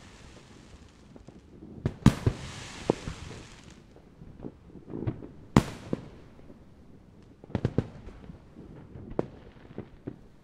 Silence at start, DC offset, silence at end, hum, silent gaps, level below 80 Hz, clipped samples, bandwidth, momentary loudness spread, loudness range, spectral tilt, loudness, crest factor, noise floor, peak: 0 s; under 0.1%; 0.05 s; none; none; -48 dBFS; under 0.1%; 15 kHz; 26 LU; 6 LU; -7 dB/octave; -32 LUFS; 32 dB; -53 dBFS; -2 dBFS